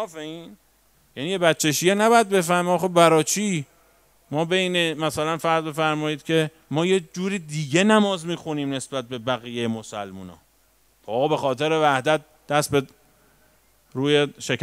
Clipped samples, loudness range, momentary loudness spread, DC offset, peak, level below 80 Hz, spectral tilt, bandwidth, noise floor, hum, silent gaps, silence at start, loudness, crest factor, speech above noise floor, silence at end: under 0.1%; 5 LU; 15 LU; under 0.1%; -2 dBFS; -64 dBFS; -4.5 dB/octave; 16 kHz; -61 dBFS; none; none; 0 s; -22 LUFS; 22 dB; 39 dB; 0 s